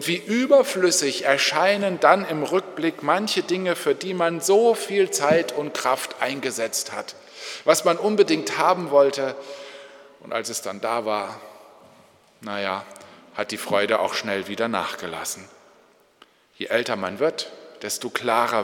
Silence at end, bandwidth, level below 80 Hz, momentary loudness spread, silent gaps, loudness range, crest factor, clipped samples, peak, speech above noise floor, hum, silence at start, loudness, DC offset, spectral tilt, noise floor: 0 s; 18.5 kHz; -76 dBFS; 16 LU; none; 9 LU; 22 dB; under 0.1%; 0 dBFS; 34 dB; none; 0 s; -22 LUFS; under 0.1%; -3 dB/octave; -57 dBFS